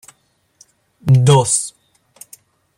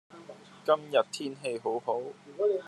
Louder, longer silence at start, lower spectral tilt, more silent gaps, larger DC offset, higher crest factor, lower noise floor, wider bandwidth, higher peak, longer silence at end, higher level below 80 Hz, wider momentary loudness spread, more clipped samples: first, -14 LUFS vs -31 LUFS; first, 1.05 s vs 0.1 s; about the same, -5 dB/octave vs -4 dB/octave; neither; neither; about the same, 16 dB vs 20 dB; first, -60 dBFS vs -50 dBFS; first, 14.5 kHz vs 12.5 kHz; first, -2 dBFS vs -12 dBFS; first, 1.1 s vs 0 s; first, -52 dBFS vs -90 dBFS; second, 15 LU vs 21 LU; neither